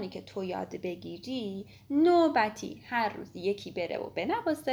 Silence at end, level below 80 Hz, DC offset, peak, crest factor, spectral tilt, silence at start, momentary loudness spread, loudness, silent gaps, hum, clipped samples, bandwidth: 0 s; -68 dBFS; under 0.1%; -12 dBFS; 18 dB; -5.5 dB/octave; 0 s; 14 LU; -31 LUFS; none; none; under 0.1%; over 20 kHz